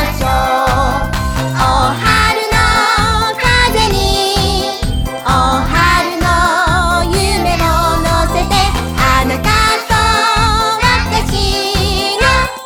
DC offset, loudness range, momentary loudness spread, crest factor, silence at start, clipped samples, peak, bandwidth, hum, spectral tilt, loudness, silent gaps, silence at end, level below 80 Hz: under 0.1%; 1 LU; 4 LU; 12 dB; 0 s; under 0.1%; 0 dBFS; 19.5 kHz; none; -4 dB/octave; -12 LUFS; none; 0 s; -20 dBFS